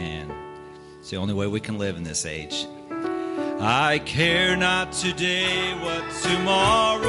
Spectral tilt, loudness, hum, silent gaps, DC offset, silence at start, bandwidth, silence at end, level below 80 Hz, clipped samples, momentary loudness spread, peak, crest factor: -3.5 dB/octave; -23 LUFS; none; none; under 0.1%; 0 s; 11.5 kHz; 0 s; -48 dBFS; under 0.1%; 16 LU; -6 dBFS; 18 dB